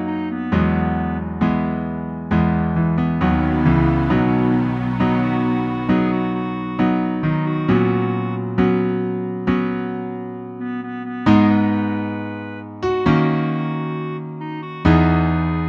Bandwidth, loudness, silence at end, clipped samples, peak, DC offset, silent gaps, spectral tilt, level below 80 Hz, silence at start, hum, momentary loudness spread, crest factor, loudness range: 6.2 kHz; -19 LUFS; 0 s; under 0.1%; -2 dBFS; under 0.1%; none; -9.5 dB/octave; -34 dBFS; 0 s; none; 11 LU; 16 dB; 3 LU